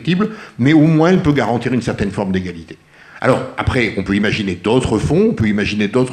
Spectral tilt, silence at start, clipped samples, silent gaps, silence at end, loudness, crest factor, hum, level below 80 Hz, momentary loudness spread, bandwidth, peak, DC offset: -7 dB/octave; 0 s; under 0.1%; none; 0 s; -16 LUFS; 16 dB; none; -40 dBFS; 8 LU; 10.5 kHz; 0 dBFS; under 0.1%